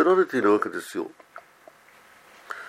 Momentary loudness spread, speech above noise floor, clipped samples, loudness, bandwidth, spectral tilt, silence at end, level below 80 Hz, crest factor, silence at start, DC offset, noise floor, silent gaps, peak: 24 LU; 31 dB; under 0.1%; -24 LUFS; 15 kHz; -5.5 dB/octave; 0 s; -78 dBFS; 18 dB; 0 s; under 0.1%; -54 dBFS; none; -8 dBFS